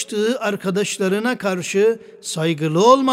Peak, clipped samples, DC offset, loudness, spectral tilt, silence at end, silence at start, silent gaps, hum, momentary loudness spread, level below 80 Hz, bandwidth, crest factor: -2 dBFS; under 0.1%; under 0.1%; -19 LUFS; -4.5 dB/octave; 0 s; 0 s; none; none; 8 LU; -66 dBFS; 16 kHz; 18 dB